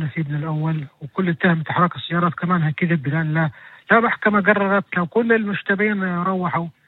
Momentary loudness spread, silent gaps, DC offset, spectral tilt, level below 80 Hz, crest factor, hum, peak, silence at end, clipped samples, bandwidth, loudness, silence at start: 8 LU; none; under 0.1%; -10 dB/octave; -62 dBFS; 18 dB; none; -2 dBFS; 0.15 s; under 0.1%; 4.2 kHz; -20 LUFS; 0 s